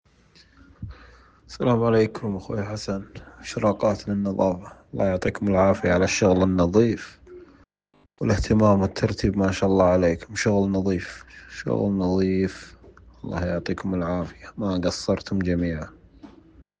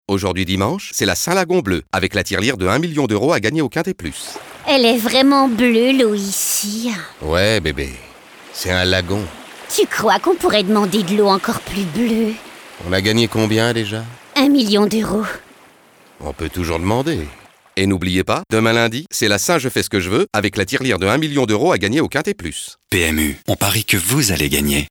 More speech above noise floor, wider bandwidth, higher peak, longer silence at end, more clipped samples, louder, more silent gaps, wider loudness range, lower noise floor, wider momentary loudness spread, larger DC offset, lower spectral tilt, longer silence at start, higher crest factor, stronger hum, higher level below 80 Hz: first, 40 dB vs 31 dB; second, 9.6 kHz vs over 20 kHz; second, -6 dBFS vs -2 dBFS; first, 0.5 s vs 0.05 s; neither; second, -23 LUFS vs -17 LUFS; neither; about the same, 5 LU vs 4 LU; first, -63 dBFS vs -48 dBFS; first, 18 LU vs 12 LU; neither; first, -6.5 dB/octave vs -4 dB/octave; first, 0.8 s vs 0.1 s; about the same, 18 dB vs 14 dB; neither; about the same, -44 dBFS vs -40 dBFS